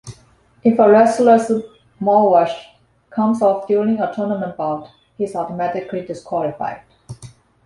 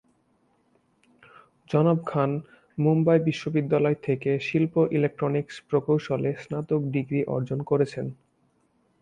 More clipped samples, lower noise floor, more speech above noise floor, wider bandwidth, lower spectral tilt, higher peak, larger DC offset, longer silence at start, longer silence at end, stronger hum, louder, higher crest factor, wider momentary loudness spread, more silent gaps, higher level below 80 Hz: neither; second, -52 dBFS vs -68 dBFS; second, 36 dB vs 43 dB; first, 11.5 kHz vs 9 kHz; second, -7 dB/octave vs -8.5 dB/octave; first, -2 dBFS vs -8 dBFS; neither; second, 0.05 s vs 1.7 s; second, 0.35 s vs 0.9 s; neither; first, -17 LUFS vs -25 LUFS; about the same, 16 dB vs 16 dB; first, 16 LU vs 7 LU; neither; first, -58 dBFS vs -64 dBFS